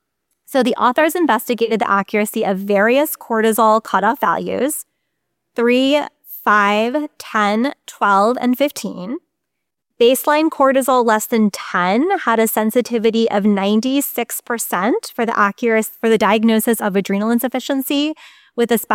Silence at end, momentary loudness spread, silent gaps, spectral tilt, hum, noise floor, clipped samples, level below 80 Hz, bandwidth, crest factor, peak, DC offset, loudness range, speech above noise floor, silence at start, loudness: 0 s; 8 LU; none; -4 dB/octave; none; -78 dBFS; under 0.1%; -64 dBFS; 17 kHz; 14 dB; -2 dBFS; under 0.1%; 2 LU; 62 dB; 0.5 s; -16 LUFS